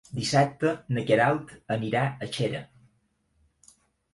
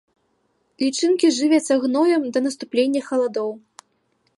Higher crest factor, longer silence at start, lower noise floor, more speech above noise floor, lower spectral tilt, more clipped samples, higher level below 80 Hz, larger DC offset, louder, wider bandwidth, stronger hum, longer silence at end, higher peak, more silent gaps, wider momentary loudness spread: about the same, 20 dB vs 16 dB; second, 0.1 s vs 0.8 s; about the same, -70 dBFS vs -67 dBFS; second, 44 dB vs 48 dB; first, -5.5 dB/octave vs -3 dB/octave; neither; first, -62 dBFS vs -78 dBFS; neither; second, -26 LUFS vs -20 LUFS; about the same, 11.5 kHz vs 11.5 kHz; neither; first, 1.5 s vs 0.8 s; about the same, -8 dBFS vs -6 dBFS; neither; about the same, 9 LU vs 7 LU